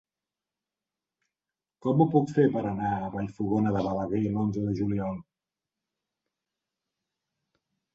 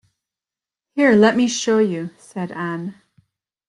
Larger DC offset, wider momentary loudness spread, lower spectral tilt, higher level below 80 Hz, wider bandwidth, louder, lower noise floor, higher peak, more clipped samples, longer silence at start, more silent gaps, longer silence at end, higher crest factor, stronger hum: neither; second, 10 LU vs 17 LU; first, -9.5 dB/octave vs -5 dB/octave; first, -58 dBFS vs -64 dBFS; second, 7.8 kHz vs 11 kHz; second, -28 LUFS vs -18 LUFS; about the same, under -90 dBFS vs -90 dBFS; second, -10 dBFS vs -2 dBFS; neither; first, 1.85 s vs 0.95 s; neither; first, 2.75 s vs 0.75 s; about the same, 20 dB vs 18 dB; neither